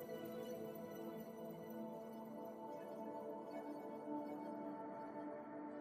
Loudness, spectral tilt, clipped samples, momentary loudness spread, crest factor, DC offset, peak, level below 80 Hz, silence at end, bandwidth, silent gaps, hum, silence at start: -50 LUFS; -6.5 dB/octave; under 0.1%; 3 LU; 14 dB; under 0.1%; -36 dBFS; -88 dBFS; 0 s; 15 kHz; none; none; 0 s